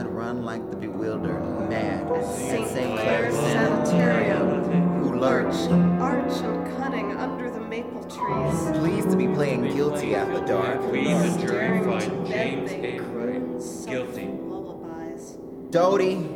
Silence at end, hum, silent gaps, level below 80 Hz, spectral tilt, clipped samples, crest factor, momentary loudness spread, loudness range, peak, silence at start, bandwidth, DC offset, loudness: 0 s; none; none; -52 dBFS; -6.5 dB/octave; under 0.1%; 18 dB; 11 LU; 6 LU; -8 dBFS; 0 s; 16 kHz; under 0.1%; -25 LUFS